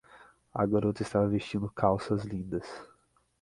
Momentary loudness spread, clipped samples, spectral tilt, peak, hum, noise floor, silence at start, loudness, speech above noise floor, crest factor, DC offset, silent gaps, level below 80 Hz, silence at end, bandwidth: 11 LU; under 0.1%; -7.5 dB/octave; -10 dBFS; none; -57 dBFS; 0.15 s; -31 LUFS; 28 dB; 22 dB; under 0.1%; none; -56 dBFS; 0.55 s; 11.5 kHz